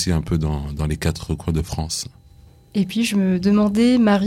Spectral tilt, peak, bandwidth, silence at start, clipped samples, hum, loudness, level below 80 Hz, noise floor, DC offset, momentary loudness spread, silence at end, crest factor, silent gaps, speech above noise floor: -6 dB/octave; -6 dBFS; 15 kHz; 0 s; under 0.1%; none; -20 LUFS; -36 dBFS; -48 dBFS; under 0.1%; 10 LU; 0 s; 14 dB; none; 29 dB